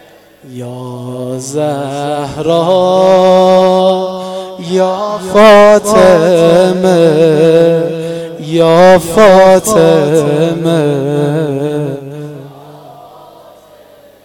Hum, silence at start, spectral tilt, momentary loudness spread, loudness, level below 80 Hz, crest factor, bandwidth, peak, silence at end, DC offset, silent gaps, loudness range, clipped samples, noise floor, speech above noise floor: 50 Hz at -50 dBFS; 0.45 s; -5.5 dB/octave; 17 LU; -8 LUFS; -44 dBFS; 10 dB; 17 kHz; 0 dBFS; 1.2 s; under 0.1%; none; 8 LU; 0.9%; -40 dBFS; 32 dB